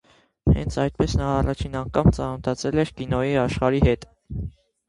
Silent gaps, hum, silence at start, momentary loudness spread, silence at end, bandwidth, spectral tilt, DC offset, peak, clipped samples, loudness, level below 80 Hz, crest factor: none; none; 0.45 s; 12 LU; 0.4 s; 11 kHz; -7 dB/octave; under 0.1%; -4 dBFS; under 0.1%; -23 LUFS; -32 dBFS; 18 dB